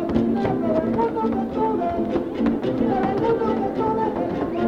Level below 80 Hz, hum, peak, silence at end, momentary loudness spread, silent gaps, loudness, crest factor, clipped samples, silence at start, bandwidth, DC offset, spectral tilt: -44 dBFS; none; -6 dBFS; 0 s; 3 LU; none; -22 LUFS; 16 dB; under 0.1%; 0 s; 6.8 kHz; under 0.1%; -9 dB/octave